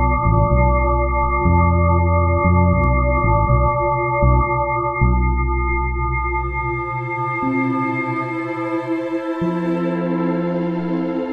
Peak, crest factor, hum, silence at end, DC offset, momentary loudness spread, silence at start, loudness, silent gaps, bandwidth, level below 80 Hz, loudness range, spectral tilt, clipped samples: -2 dBFS; 16 dB; none; 0 s; under 0.1%; 7 LU; 0 s; -18 LUFS; none; 4.5 kHz; -24 dBFS; 5 LU; -10.5 dB/octave; under 0.1%